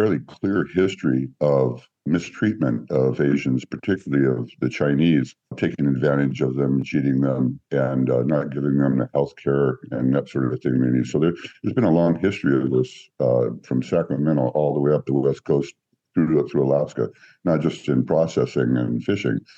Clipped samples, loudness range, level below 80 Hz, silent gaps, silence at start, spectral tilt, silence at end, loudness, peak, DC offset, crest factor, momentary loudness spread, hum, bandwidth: under 0.1%; 1 LU; -56 dBFS; none; 0 s; -8 dB/octave; 0.2 s; -22 LUFS; -6 dBFS; under 0.1%; 14 dB; 5 LU; none; 7.8 kHz